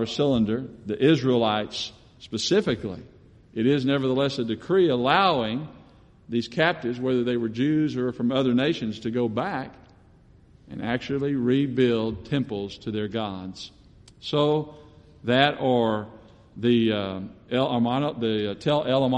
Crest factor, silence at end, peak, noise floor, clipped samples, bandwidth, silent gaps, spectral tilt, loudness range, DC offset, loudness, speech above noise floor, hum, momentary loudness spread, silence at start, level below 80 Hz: 20 dB; 0 s; -6 dBFS; -54 dBFS; under 0.1%; 9 kHz; none; -6 dB/octave; 3 LU; under 0.1%; -24 LUFS; 30 dB; none; 13 LU; 0 s; -56 dBFS